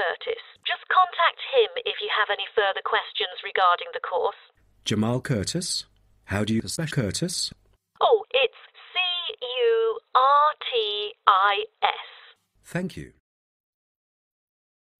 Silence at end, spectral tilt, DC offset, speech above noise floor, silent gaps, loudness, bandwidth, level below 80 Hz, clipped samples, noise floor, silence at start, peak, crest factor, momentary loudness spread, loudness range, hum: 1.9 s; -3.5 dB/octave; under 0.1%; 30 dB; none; -24 LUFS; 14.5 kHz; -60 dBFS; under 0.1%; -54 dBFS; 0 s; -2 dBFS; 24 dB; 11 LU; 5 LU; none